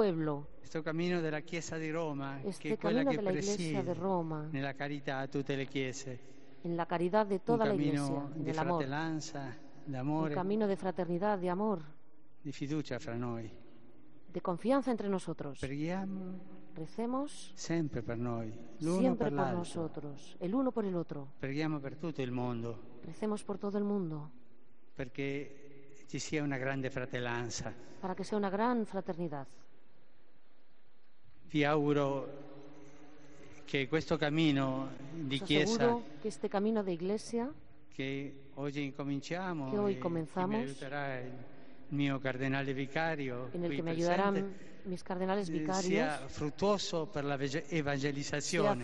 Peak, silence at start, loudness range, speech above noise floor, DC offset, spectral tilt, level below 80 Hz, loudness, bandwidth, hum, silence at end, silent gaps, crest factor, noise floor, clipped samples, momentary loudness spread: -14 dBFS; 0 s; 5 LU; 37 dB; 0.5%; -6 dB/octave; -66 dBFS; -36 LUFS; 10 kHz; none; 0 s; none; 22 dB; -72 dBFS; under 0.1%; 13 LU